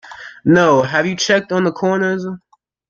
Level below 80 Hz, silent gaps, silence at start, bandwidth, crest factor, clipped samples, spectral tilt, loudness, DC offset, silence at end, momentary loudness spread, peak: -56 dBFS; none; 0.05 s; 7.4 kHz; 16 dB; under 0.1%; -5 dB/octave; -15 LUFS; under 0.1%; 0.5 s; 15 LU; -2 dBFS